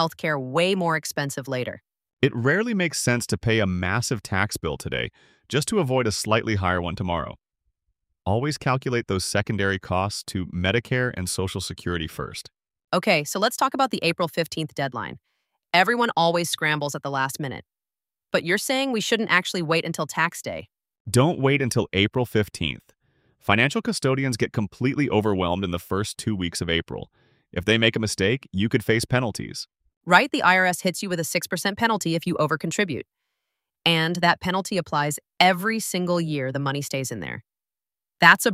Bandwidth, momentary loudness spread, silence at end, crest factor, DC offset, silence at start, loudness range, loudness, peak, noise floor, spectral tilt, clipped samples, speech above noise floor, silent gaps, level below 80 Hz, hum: 16 kHz; 10 LU; 0 s; 22 dB; under 0.1%; 0 s; 4 LU; -23 LUFS; -2 dBFS; under -90 dBFS; -4.5 dB/octave; under 0.1%; over 67 dB; 2.13-2.17 s, 21.00-21.05 s, 29.97-30.01 s; -52 dBFS; none